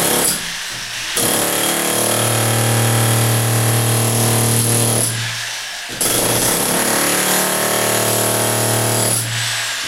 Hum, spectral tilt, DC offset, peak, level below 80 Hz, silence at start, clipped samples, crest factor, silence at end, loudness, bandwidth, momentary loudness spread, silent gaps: none; -3 dB/octave; under 0.1%; -2 dBFS; -46 dBFS; 0 s; under 0.1%; 14 dB; 0 s; -15 LUFS; 16 kHz; 6 LU; none